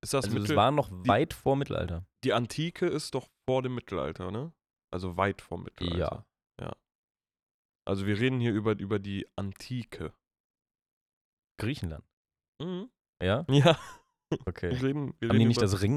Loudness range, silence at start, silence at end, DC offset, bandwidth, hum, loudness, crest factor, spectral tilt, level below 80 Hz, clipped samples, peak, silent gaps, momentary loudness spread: 10 LU; 0.05 s; 0 s; under 0.1%; 14.5 kHz; none; -30 LUFS; 24 dB; -6 dB/octave; -56 dBFS; under 0.1%; -8 dBFS; 4.84-4.88 s, 6.95-7.08 s, 7.43-7.80 s, 10.40-10.54 s, 10.82-11.37 s, 12.13-12.25 s, 12.48-12.53 s, 13.09-13.13 s; 17 LU